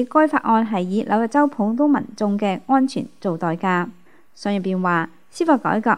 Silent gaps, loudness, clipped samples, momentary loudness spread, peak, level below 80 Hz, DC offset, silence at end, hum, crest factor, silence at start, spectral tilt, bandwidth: none; -20 LUFS; under 0.1%; 7 LU; -2 dBFS; -70 dBFS; 0.5%; 0 s; none; 18 dB; 0 s; -7 dB/octave; 11 kHz